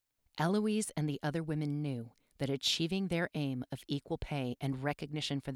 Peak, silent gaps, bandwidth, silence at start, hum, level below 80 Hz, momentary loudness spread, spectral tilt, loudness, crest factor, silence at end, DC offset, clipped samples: -20 dBFS; none; 16 kHz; 0.35 s; none; -58 dBFS; 8 LU; -5 dB/octave; -36 LUFS; 16 dB; 0 s; under 0.1%; under 0.1%